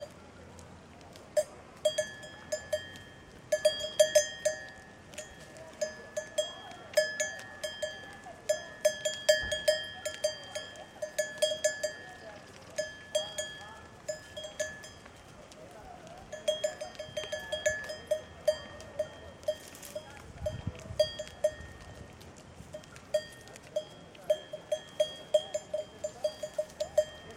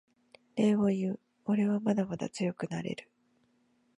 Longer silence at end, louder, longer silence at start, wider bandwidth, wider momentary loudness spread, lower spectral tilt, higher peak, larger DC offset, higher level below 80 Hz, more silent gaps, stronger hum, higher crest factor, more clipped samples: second, 0 s vs 0.95 s; about the same, -34 LUFS vs -32 LUFS; second, 0 s vs 0.55 s; first, 16 kHz vs 10.5 kHz; first, 19 LU vs 12 LU; second, -2 dB/octave vs -7 dB/octave; first, -10 dBFS vs -16 dBFS; neither; first, -62 dBFS vs -72 dBFS; neither; neither; first, 24 dB vs 16 dB; neither